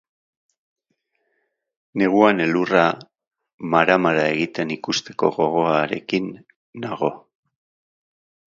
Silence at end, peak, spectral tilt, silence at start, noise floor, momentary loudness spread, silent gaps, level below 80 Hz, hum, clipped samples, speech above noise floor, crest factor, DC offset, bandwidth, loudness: 1.3 s; 0 dBFS; -5.5 dB/octave; 1.95 s; -73 dBFS; 15 LU; 3.27-3.31 s, 3.53-3.58 s, 6.56-6.73 s; -64 dBFS; none; under 0.1%; 53 dB; 22 dB; under 0.1%; 7.6 kHz; -20 LUFS